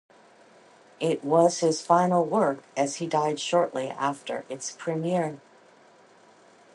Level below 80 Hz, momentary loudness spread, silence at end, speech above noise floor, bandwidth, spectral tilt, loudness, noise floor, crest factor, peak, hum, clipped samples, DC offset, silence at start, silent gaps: -76 dBFS; 12 LU; 1.4 s; 30 dB; 11.5 kHz; -5 dB/octave; -26 LUFS; -56 dBFS; 20 dB; -6 dBFS; none; under 0.1%; under 0.1%; 1 s; none